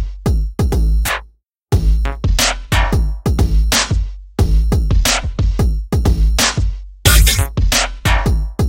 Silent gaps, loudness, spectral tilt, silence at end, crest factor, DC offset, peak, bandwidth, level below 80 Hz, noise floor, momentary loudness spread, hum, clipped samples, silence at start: 1.43-1.47 s, 1.63-1.67 s; -16 LUFS; -3.5 dB/octave; 0 s; 14 dB; under 0.1%; 0 dBFS; 16.5 kHz; -16 dBFS; -46 dBFS; 6 LU; none; under 0.1%; 0 s